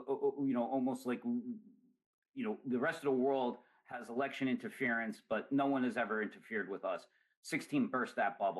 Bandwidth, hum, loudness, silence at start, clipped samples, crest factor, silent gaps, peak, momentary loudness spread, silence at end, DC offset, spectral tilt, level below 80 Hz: 12 kHz; none; -37 LUFS; 0 s; under 0.1%; 14 dB; 2.06-2.22 s, 2.29-2.33 s, 7.37-7.43 s; -24 dBFS; 10 LU; 0 s; under 0.1%; -6 dB/octave; -86 dBFS